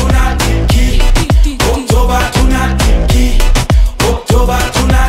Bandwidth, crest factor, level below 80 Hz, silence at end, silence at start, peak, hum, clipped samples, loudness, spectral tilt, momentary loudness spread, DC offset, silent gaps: 16 kHz; 8 dB; -10 dBFS; 0 s; 0 s; 0 dBFS; none; under 0.1%; -12 LUFS; -5 dB/octave; 2 LU; under 0.1%; none